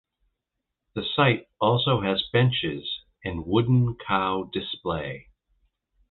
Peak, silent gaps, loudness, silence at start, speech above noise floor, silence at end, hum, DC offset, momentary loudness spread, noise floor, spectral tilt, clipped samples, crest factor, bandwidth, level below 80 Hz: -6 dBFS; none; -25 LUFS; 0.95 s; 59 dB; 0.9 s; none; under 0.1%; 12 LU; -83 dBFS; -10 dB/octave; under 0.1%; 20 dB; 4.3 kHz; -50 dBFS